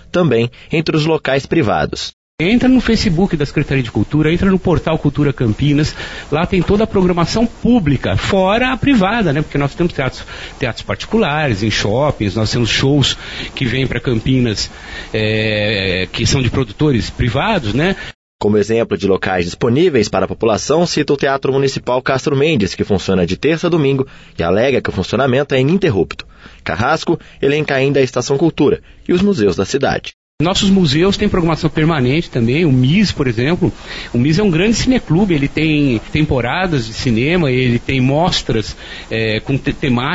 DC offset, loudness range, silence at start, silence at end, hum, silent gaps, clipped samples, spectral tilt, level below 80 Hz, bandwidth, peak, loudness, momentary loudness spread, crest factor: under 0.1%; 2 LU; 0.15 s; 0 s; none; 2.13-2.38 s, 18.15-18.39 s, 30.14-30.38 s; under 0.1%; -6 dB/octave; -32 dBFS; 8 kHz; -2 dBFS; -15 LUFS; 7 LU; 12 dB